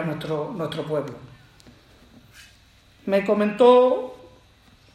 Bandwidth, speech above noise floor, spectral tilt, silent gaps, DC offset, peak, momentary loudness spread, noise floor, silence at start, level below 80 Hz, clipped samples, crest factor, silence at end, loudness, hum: 12 kHz; 34 dB; -7 dB/octave; none; under 0.1%; -4 dBFS; 22 LU; -54 dBFS; 0 s; -60 dBFS; under 0.1%; 20 dB; 0.8 s; -21 LUFS; none